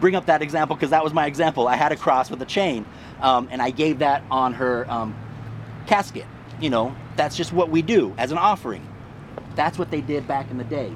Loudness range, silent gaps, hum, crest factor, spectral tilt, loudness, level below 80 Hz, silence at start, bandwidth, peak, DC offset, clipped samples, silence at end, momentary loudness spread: 3 LU; none; none; 20 dB; -5.5 dB/octave; -22 LUFS; -52 dBFS; 0 s; 13.5 kHz; -2 dBFS; under 0.1%; under 0.1%; 0 s; 16 LU